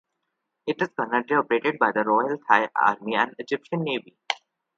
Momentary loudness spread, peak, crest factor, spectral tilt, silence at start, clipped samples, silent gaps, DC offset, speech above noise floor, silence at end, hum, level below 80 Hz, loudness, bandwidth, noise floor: 10 LU; -2 dBFS; 24 dB; -5.5 dB/octave; 0.65 s; under 0.1%; none; under 0.1%; 56 dB; 0.4 s; none; -76 dBFS; -24 LUFS; 7.8 kHz; -79 dBFS